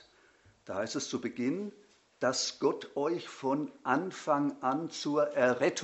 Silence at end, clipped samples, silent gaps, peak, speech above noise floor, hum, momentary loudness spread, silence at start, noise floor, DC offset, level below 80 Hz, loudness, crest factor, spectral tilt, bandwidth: 0 s; under 0.1%; none; -12 dBFS; 32 dB; none; 8 LU; 0.65 s; -64 dBFS; under 0.1%; -78 dBFS; -32 LUFS; 20 dB; -4 dB/octave; 8.2 kHz